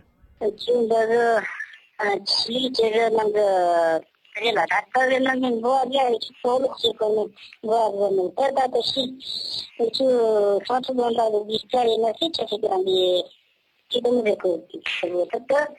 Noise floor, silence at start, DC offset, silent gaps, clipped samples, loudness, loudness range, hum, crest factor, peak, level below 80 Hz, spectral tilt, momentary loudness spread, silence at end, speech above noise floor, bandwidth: -65 dBFS; 0.4 s; under 0.1%; none; under 0.1%; -22 LUFS; 2 LU; none; 14 dB; -8 dBFS; -66 dBFS; -3.5 dB/octave; 8 LU; 0.05 s; 43 dB; 12 kHz